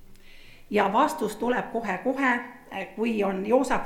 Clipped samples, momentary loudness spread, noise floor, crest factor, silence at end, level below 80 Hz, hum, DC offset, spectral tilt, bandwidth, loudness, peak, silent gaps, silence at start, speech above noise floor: under 0.1%; 7 LU; -47 dBFS; 18 dB; 0 s; -52 dBFS; none; under 0.1%; -5 dB/octave; 16.5 kHz; -26 LUFS; -8 dBFS; none; 0 s; 21 dB